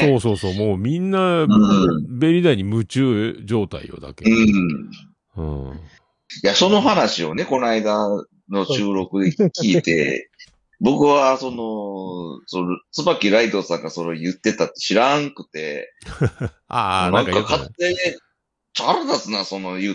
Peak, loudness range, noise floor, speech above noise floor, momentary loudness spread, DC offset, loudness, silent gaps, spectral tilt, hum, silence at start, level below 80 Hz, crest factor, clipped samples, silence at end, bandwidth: -2 dBFS; 4 LU; -71 dBFS; 52 dB; 14 LU; under 0.1%; -19 LUFS; none; -5.5 dB/octave; none; 0 s; -48 dBFS; 18 dB; under 0.1%; 0 s; 10.5 kHz